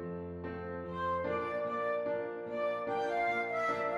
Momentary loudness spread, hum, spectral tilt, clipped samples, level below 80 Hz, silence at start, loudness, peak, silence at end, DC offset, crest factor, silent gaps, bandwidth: 9 LU; none; -6.5 dB/octave; under 0.1%; -68 dBFS; 0 s; -35 LUFS; -22 dBFS; 0 s; under 0.1%; 14 dB; none; 11.5 kHz